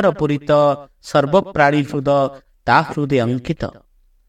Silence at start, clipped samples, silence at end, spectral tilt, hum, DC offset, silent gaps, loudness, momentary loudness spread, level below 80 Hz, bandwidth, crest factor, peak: 0 s; under 0.1%; 0.6 s; -7 dB/octave; none; under 0.1%; none; -17 LUFS; 10 LU; -46 dBFS; 11.5 kHz; 18 dB; 0 dBFS